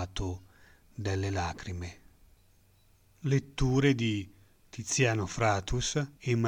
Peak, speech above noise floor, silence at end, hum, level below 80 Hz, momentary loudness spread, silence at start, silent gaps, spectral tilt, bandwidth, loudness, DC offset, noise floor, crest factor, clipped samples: -12 dBFS; 34 dB; 0 s; none; -46 dBFS; 16 LU; 0 s; none; -5 dB/octave; 15 kHz; -31 LUFS; under 0.1%; -63 dBFS; 20 dB; under 0.1%